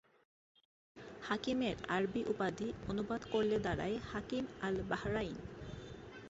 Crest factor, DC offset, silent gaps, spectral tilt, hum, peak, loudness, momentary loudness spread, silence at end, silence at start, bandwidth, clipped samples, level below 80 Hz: 18 dB; under 0.1%; none; -4.5 dB/octave; none; -22 dBFS; -38 LUFS; 14 LU; 0 s; 0.95 s; 8 kHz; under 0.1%; -58 dBFS